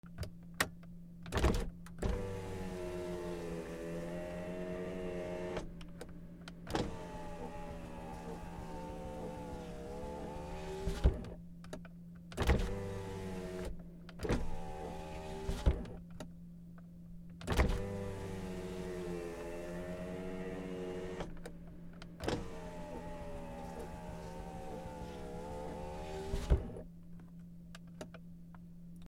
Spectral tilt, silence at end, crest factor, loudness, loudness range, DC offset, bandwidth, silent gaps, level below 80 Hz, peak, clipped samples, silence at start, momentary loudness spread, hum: -6 dB/octave; 0 s; 26 dB; -42 LUFS; 6 LU; under 0.1%; 16.5 kHz; none; -44 dBFS; -16 dBFS; under 0.1%; 0.05 s; 16 LU; none